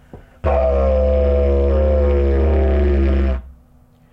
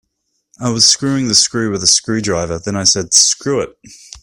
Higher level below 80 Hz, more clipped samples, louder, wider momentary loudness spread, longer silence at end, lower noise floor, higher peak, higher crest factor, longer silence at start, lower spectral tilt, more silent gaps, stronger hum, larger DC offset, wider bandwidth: first, -18 dBFS vs -48 dBFS; neither; second, -17 LUFS vs -12 LUFS; second, 4 LU vs 11 LU; first, 0.6 s vs 0.05 s; second, -50 dBFS vs -69 dBFS; second, -6 dBFS vs 0 dBFS; second, 10 dB vs 16 dB; second, 0.15 s vs 0.6 s; first, -10 dB/octave vs -2 dB/octave; neither; neither; neither; second, 3.8 kHz vs over 20 kHz